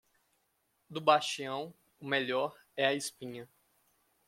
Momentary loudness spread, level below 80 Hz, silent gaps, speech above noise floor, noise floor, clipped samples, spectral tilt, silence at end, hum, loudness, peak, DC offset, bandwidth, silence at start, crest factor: 18 LU; -82 dBFS; none; 45 dB; -77 dBFS; under 0.1%; -3 dB/octave; 0.8 s; none; -32 LUFS; -10 dBFS; under 0.1%; 16.5 kHz; 0.9 s; 24 dB